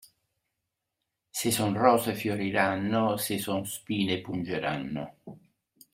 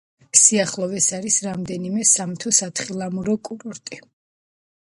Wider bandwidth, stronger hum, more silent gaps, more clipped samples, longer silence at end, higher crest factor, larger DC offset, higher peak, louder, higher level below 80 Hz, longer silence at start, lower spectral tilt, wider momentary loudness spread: first, 16 kHz vs 11.5 kHz; neither; neither; neither; second, 0.6 s vs 0.95 s; about the same, 24 dB vs 22 dB; neither; second, -6 dBFS vs 0 dBFS; second, -28 LUFS vs -18 LUFS; about the same, -66 dBFS vs -62 dBFS; first, 1.35 s vs 0.35 s; first, -4.5 dB/octave vs -2.5 dB/octave; second, 11 LU vs 20 LU